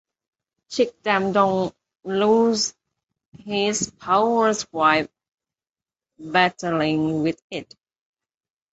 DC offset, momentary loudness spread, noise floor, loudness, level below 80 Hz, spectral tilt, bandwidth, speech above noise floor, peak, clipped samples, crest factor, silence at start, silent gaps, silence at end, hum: under 0.1%; 13 LU; under -90 dBFS; -21 LUFS; -62 dBFS; -4 dB/octave; 8.2 kHz; over 69 dB; -2 dBFS; under 0.1%; 20 dB; 0.7 s; 3.28-3.32 s, 5.34-5.38 s, 7.42-7.50 s; 1.1 s; none